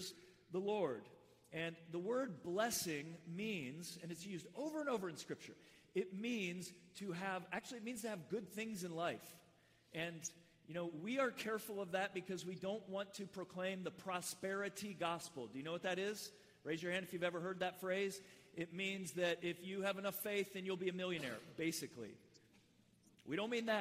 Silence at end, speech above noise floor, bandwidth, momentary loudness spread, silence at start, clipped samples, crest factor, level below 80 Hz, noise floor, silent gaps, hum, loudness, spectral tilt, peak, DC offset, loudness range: 0 s; 28 dB; 16 kHz; 11 LU; 0 s; under 0.1%; 18 dB; -84 dBFS; -72 dBFS; none; none; -44 LUFS; -4 dB/octave; -26 dBFS; under 0.1%; 3 LU